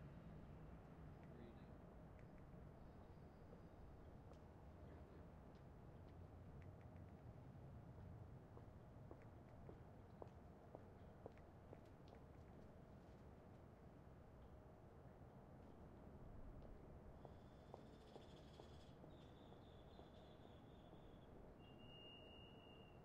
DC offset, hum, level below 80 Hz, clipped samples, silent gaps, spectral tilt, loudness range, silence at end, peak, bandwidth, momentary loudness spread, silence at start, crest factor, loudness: under 0.1%; none; -70 dBFS; under 0.1%; none; -7.5 dB/octave; 2 LU; 0 s; -38 dBFS; 8.2 kHz; 3 LU; 0 s; 22 dB; -63 LUFS